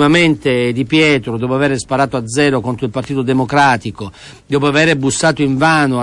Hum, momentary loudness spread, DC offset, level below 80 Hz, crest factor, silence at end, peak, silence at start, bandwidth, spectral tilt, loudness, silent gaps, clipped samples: none; 8 LU; under 0.1%; -44 dBFS; 12 dB; 0 s; -2 dBFS; 0 s; 11.5 kHz; -5 dB/octave; -14 LUFS; none; under 0.1%